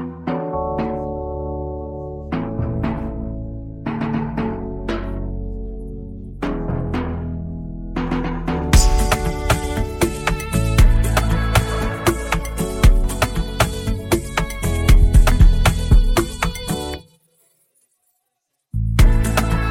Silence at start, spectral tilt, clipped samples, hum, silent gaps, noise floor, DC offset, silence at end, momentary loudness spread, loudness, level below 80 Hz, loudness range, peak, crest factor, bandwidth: 0 s; -5.5 dB/octave; under 0.1%; none; none; -74 dBFS; under 0.1%; 0 s; 13 LU; -21 LUFS; -20 dBFS; 8 LU; -2 dBFS; 16 dB; 16.5 kHz